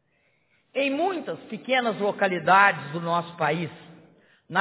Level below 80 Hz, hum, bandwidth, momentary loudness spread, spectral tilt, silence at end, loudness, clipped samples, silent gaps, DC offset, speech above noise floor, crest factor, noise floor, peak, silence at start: -74 dBFS; none; 4 kHz; 15 LU; -9 dB/octave; 0 s; -24 LUFS; under 0.1%; none; under 0.1%; 44 dB; 22 dB; -68 dBFS; -4 dBFS; 0.75 s